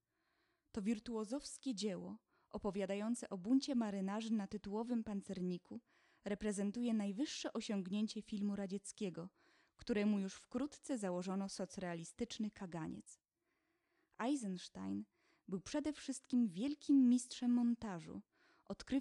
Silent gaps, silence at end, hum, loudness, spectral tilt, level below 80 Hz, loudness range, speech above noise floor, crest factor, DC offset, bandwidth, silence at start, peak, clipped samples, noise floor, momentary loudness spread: none; 0 s; none; -41 LUFS; -5.5 dB/octave; -72 dBFS; 8 LU; 45 dB; 16 dB; under 0.1%; 11.5 kHz; 0.75 s; -26 dBFS; under 0.1%; -86 dBFS; 13 LU